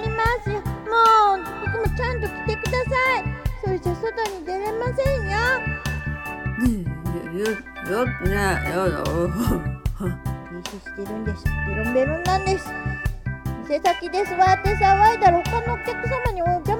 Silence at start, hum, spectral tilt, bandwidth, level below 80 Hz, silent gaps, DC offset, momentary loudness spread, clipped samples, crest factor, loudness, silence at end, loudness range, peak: 0 s; none; -6 dB/octave; 17.5 kHz; -32 dBFS; none; under 0.1%; 11 LU; under 0.1%; 18 dB; -22 LUFS; 0 s; 5 LU; -4 dBFS